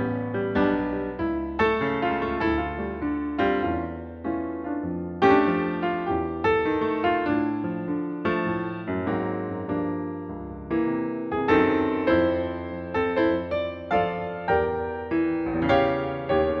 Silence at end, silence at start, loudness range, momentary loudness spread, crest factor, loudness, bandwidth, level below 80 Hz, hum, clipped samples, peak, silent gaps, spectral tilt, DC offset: 0 s; 0 s; 4 LU; 8 LU; 18 dB; -25 LUFS; 6.2 kHz; -46 dBFS; none; under 0.1%; -8 dBFS; none; -8.5 dB/octave; under 0.1%